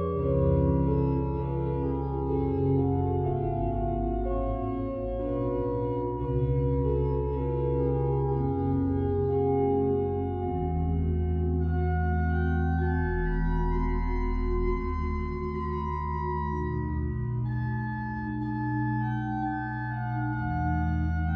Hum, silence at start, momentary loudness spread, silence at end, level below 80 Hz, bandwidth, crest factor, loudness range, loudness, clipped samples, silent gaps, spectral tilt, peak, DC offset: none; 0 s; 6 LU; 0 s; -34 dBFS; 4.4 kHz; 14 dB; 4 LU; -29 LUFS; under 0.1%; none; -11 dB/octave; -14 dBFS; under 0.1%